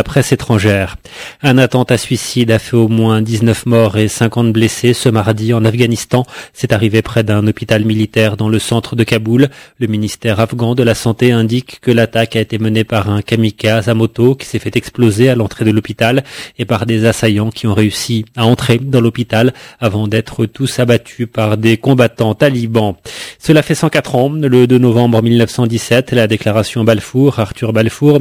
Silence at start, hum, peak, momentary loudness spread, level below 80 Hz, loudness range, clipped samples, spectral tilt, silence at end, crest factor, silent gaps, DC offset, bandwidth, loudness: 0 s; none; 0 dBFS; 6 LU; -38 dBFS; 2 LU; 0.2%; -6 dB/octave; 0 s; 12 dB; none; under 0.1%; 16 kHz; -12 LUFS